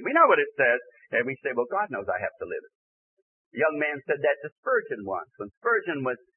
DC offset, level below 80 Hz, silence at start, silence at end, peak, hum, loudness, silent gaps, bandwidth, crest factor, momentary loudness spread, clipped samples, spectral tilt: under 0.1%; -74 dBFS; 0 s; 0.2 s; -6 dBFS; none; -26 LUFS; 2.75-3.51 s, 4.52-4.63 s, 5.57-5.61 s; 3.3 kHz; 20 dB; 13 LU; under 0.1%; -9 dB/octave